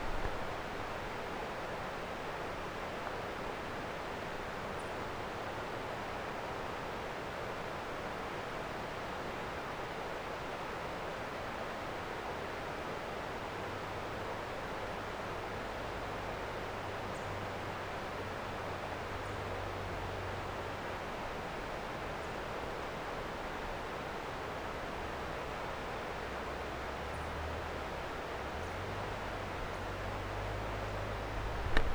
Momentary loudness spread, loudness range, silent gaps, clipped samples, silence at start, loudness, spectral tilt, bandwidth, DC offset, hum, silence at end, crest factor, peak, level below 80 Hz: 1 LU; 0 LU; none; under 0.1%; 0 s; -41 LUFS; -5 dB/octave; over 20 kHz; under 0.1%; none; 0 s; 26 dB; -14 dBFS; -48 dBFS